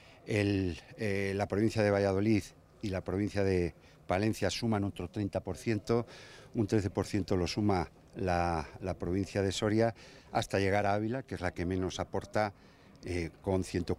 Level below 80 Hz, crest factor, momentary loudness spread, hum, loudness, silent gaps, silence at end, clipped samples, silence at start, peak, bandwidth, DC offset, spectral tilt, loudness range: -56 dBFS; 18 dB; 9 LU; none; -33 LUFS; none; 0.05 s; under 0.1%; 0.25 s; -14 dBFS; 14.5 kHz; under 0.1%; -6 dB/octave; 2 LU